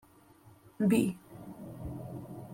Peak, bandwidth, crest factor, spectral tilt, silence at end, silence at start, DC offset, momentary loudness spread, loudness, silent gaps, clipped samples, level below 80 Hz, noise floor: -14 dBFS; 16.5 kHz; 20 dB; -7 dB/octave; 0 s; 0.45 s; under 0.1%; 19 LU; -33 LUFS; none; under 0.1%; -60 dBFS; -59 dBFS